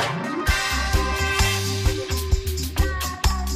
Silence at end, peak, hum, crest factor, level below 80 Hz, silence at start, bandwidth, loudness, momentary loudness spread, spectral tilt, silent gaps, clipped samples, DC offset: 0 s; -8 dBFS; none; 14 dB; -26 dBFS; 0 s; 15.5 kHz; -23 LUFS; 4 LU; -3.5 dB/octave; none; under 0.1%; under 0.1%